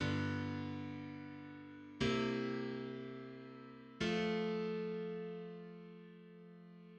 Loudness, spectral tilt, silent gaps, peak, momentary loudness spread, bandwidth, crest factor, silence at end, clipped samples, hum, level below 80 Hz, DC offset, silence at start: -41 LUFS; -6 dB/octave; none; -24 dBFS; 19 LU; 9 kHz; 18 dB; 0 s; under 0.1%; none; -68 dBFS; under 0.1%; 0 s